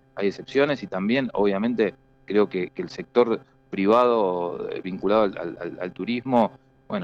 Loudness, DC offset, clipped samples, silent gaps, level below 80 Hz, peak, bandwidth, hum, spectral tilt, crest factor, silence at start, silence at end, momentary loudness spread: -24 LUFS; under 0.1%; under 0.1%; none; -60 dBFS; -6 dBFS; 7.4 kHz; none; -7.5 dB/octave; 16 dB; 0.15 s; 0 s; 11 LU